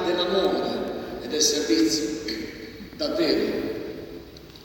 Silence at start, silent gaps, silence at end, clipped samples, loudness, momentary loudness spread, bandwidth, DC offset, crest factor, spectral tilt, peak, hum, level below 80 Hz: 0 s; none; 0 s; under 0.1%; -25 LUFS; 18 LU; over 20 kHz; under 0.1%; 18 dB; -3 dB/octave; -8 dBFS; none; -52 dBFS